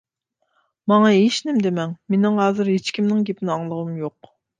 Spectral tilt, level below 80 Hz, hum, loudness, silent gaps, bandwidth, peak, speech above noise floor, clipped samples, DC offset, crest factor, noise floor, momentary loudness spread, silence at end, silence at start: -6 dB/octave; -68 dBFS; none; -20 LUFS; none; 9.4 kHz; -4 dBFS; 54 dB; under 0.1%; under 0.1%; 16 dB; -73 dBFS; 12 LU; 0.5 s; 0.85 s